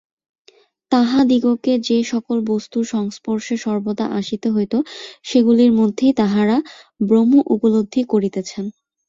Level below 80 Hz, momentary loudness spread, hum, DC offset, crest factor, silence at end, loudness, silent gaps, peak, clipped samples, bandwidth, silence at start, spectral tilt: -58 dBFS; 11 LU; none; under 0.1%; 14 dB; 0.4 s; -18 LUFS; none; -2 dBFS; under 0.1%; 7.6 kHz; 0.9 s; -6 dB/octave